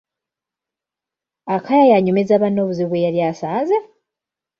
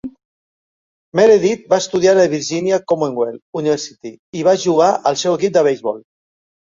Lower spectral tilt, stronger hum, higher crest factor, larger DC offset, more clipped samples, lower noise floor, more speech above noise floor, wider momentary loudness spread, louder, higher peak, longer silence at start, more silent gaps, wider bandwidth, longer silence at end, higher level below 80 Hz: first, -8 dB/octave vs -4.5 dB/octave; neither; about the same, 16 dB vs 16 dB; neither; neither; about the same, -87 dBFS vs under -90 dBFS; second, 71 dB vs over 75 dB; about the same, 10 LU vs 12 LU; about the same, -17 LUFS vs -16 LUFS; about the same, -2 dBFS vs -2 dBFS; first, 1.45 s vs 0.05 s; second, none vs 0.25-1.12 s, 3.42-3.53 s, 4.19-4.33 s; about the same, 7 kHz vs 7.6 kHz; about the same, 0.75 s vs 0.65 s; about the same, -64 dBFS vs -60 dBFS